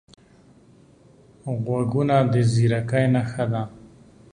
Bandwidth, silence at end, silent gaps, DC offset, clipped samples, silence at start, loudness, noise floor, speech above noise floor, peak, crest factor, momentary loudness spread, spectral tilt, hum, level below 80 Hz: 10 kHz; 0.45 s; none; under 0.1%; under 0.1%; 1.45 s; -22 LUFS; -53 dBFS; 32 dB; -6 dBFS; 18 dB; 11 LU; -7.5 dB/octave; none; -54 dBFS